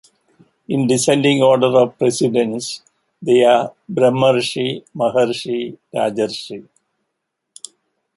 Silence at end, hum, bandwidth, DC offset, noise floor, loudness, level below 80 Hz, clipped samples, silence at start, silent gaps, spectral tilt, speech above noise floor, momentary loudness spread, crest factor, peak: 1.55 s; none; 11.5 kHz; under 0.1%; -76 dBFS; -17 LUFS; -62 dBFS; under 0.1%; 0.7 s; none; -5 dB/octave; 60 dB; 18 LU; 16 dB; -2 dBFS